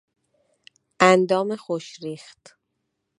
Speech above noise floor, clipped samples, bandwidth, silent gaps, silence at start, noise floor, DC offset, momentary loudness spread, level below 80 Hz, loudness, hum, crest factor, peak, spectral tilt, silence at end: 53 dB; under 0.1%; 11 kHz; none; 1 s; -77 dBFS; under 0.1%; 19 LU; -70 dBFS; -20 LUFS; none; 24 dB; 0 dBFS; -5 dB/octave; 1 s